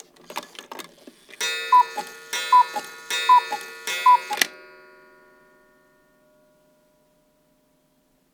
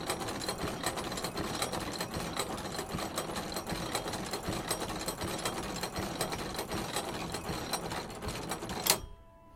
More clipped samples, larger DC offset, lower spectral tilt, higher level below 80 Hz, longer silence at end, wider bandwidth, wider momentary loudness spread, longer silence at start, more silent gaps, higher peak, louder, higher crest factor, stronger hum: neither; neither; second, 1 dB/octave vs -3 dB/octave; second, -76 dBFS vs -52 dBFS; first, 3.8 s vs 0 s; first, over 20 kHz vs 17 kHz; first, 20 LU vs 5 LU; first, 0.3 s vs 0 s; neither; first, -2 dBFS vs -6 dBFS; first, -21 LUFS vs -36 LUFS; second, 24 dB vs 30 dB; neither